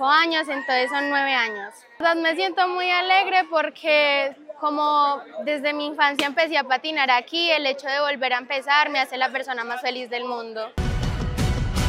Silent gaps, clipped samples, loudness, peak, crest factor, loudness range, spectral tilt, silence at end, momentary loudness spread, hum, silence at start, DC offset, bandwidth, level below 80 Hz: none; under 0.1%; -22 LUFS; -4 dBFS; 18 dB; 3 LU; -4.5 dB/octave; 0 s; 10 LU; none; 0 s; under 0.1%; 16 kHz; -38 dBFS